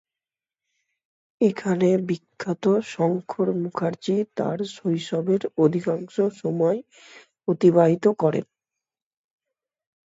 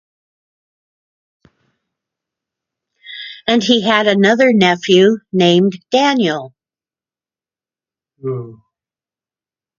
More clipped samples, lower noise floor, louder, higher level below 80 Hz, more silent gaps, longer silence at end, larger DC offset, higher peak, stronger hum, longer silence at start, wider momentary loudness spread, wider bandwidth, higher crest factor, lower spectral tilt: neither; about the same, under -90 dBFS vs under -90 dBFS; second, -23 LUFS vs -13 LUFS; second, -70 dBFS vs -62 dBFS; neither; first, 1.65 s vs 1.25 s; neither; second, -6 dBFS vs 0 dBFS; neither; second, 1.4 s vs 3.1 s; second, 9 LU vs 16 LU; about the same, 8 kHz vs 7.4 kHz; about the same, 18 dB vs 18 dB; first, -7.5 dB/octave vs -5 dB/octave